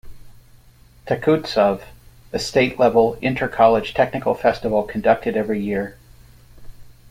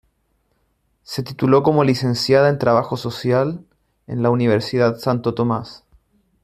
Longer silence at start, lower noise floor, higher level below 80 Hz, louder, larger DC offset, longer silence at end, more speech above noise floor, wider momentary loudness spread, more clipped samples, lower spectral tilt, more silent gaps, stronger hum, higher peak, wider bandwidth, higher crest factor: second, 0.05 s vs 1.1 s; second, -49 dBFS vs -66 dBFS; first, -46 dBFS vs -56 dBFS; about the same, -19 LUFS vs -18 LUFS; neither; second, 0.25 s vs 0.65 s; second, 31 dB vs 48 dB; second, 10 LU vs 13 LU; neither; about the same, -6 dB/octave vs -7 dB/octave; neither; neither; about the same, -2 dBFS vs -2 dBFS; about the same, 16 kHz vs 15 kHz; about the same, 18 dB vs 18 dB